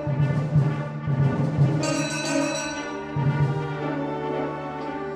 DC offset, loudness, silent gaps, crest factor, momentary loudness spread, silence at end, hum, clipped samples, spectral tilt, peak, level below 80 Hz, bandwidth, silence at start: under 0.1%; -25 LUFS; none; 14 dB; 8 LU; 0 s; none; under 0.1%; -6 dB/octave; -10 dBFS; -50 dBFS; 11.5 kHz; 0 s